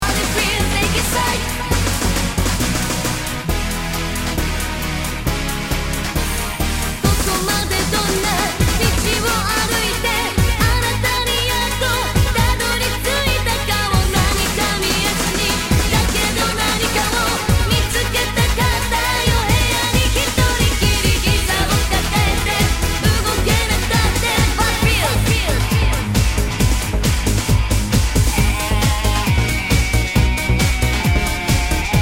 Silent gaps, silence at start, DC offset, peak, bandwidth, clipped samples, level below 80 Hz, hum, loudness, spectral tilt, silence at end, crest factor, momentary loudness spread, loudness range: none; 0 s; under 0.1%; -2 dBFS; 16.5 kHz; under 0.1%; -22 dBFS; none; -17 LUFS; -3.5 dB/octave; 0 s; 14 dB; 5 LU; 4 LU